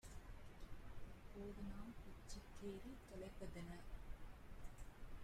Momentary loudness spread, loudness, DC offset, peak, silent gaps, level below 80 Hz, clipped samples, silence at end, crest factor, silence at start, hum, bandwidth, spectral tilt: 7 LU; -58 LUFS; under 0.1%; -40 dBFS; none; -58 dBFS; under 0.1%; 0 s; 14 dB; 0.05 s; none; 16 kHz; -5.5 dB/octave